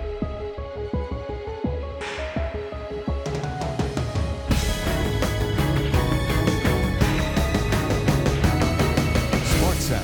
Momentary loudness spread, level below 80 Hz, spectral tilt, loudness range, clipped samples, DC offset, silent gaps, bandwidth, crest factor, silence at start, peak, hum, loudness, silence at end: 9 LU; -30 dBFS; -5.5 dB/octave; 7 LU; under 0.1%; under 0.1%; none; 19.5 kHz; 16 dB; 0 s; -6 dBFS; none; -24 LUFS; 0 s